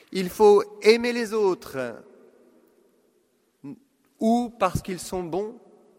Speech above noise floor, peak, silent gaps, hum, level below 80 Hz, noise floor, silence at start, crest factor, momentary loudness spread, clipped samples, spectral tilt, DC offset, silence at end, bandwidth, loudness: 44 dB; -2 dBFS; none; none; -54 dBFS; -67 dBFS; 0.1 s; 24 dB; 20 LU; under 0.1%; -5 dB/octave; under 0.1%; 0.4 s; 16 kHz; -23 LUFS